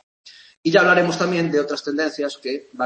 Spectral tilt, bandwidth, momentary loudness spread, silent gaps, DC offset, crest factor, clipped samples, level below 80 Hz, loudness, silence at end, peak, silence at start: -5 dB/octave; 8.8 kHz; 12 LU; 0.57-0.63 s; under 0.1%; 20 dB; under 0.1%; -68 dBFS; -20 LUFS; 0 s; -2 dBFS; 0.25 s